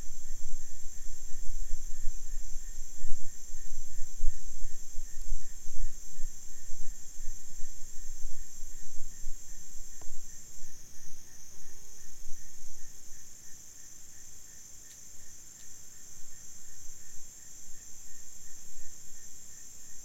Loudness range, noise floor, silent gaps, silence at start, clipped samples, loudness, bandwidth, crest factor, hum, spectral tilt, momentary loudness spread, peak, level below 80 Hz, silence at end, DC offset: 5 LU; -46 dBFS; none; 0 s; under 0.1%; -46 LUFS; 13 kHz; 16 dB; none; -2.5 dB/octave; 5 LU; -8 dBFS; -38 dBFS; 0.05 s; under 0.1%